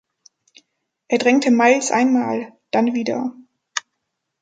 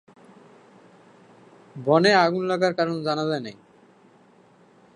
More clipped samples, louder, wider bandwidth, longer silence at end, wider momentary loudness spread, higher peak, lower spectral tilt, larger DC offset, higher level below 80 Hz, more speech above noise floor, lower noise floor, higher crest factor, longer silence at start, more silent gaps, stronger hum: neither; first, -19 LUFS vs -22 LUFS; second, 9.2 kHz vs 10.5 kHz; second, 0.6 s vs 1.45 s; about the same, 14 LU vs 14 LU; first, 0 dBFS vs -4 dBFS; second, -3.5 dB/octave vs -5.5 dB/octave; neither; about the same, -72 dBFS vs -74 dBFS; first, 60 dB vs 34 dB; first, -77 dBFS vs -55 dBFS; about the same, 20 dB vs 22 dB; second, 1.1 s vs 1.75 s; neither; neither